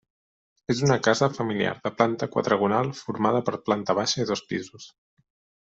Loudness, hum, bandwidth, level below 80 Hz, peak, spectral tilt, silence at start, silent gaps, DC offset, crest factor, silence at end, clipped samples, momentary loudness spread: -25 LUFS; none; 8 kHz; -62 dBFS; -4 dBFS; -5 dB/octave; 0.7 s; none; under 0.1%; 22 dB; 0.8 s; under 0.1%; 8 LU